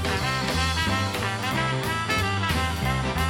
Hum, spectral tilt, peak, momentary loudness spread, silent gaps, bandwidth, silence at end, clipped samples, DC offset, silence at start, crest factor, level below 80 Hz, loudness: none; -4.5 dB/octave; -10 dBFS; 2 LU; none; 19 kHz; 0 s; under 0.1%; under 0.1%; 0 s; 14 dB; -36 dBFS; -25 LUFS